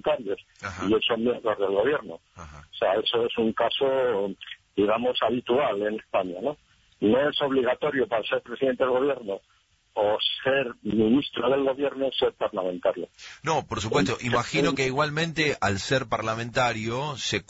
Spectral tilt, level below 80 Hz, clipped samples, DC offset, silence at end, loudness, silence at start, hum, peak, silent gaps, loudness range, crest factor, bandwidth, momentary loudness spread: -5 dB/octave; -56 dBFS; under 0.1%; under 0.1%; 0.05 s; -26 LUFS; 0.05 s; none; -12 dBFS; none; 1 LU; 14 dB; 8 kHz; 10 LU